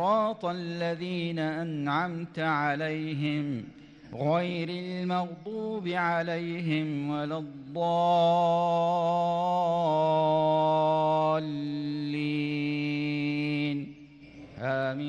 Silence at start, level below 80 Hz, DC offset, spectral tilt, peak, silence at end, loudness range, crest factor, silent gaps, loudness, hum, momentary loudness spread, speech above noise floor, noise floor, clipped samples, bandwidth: 0 s; -68 dBFS; under 0.1%; -7.5 dB/octave; -16 dBFS; 0 s; 6 LU; 12 dB; none; -29 LUFS; none; 9 LU; 21 dB; -49 dBFS; under 0.1%; 9.4 kHz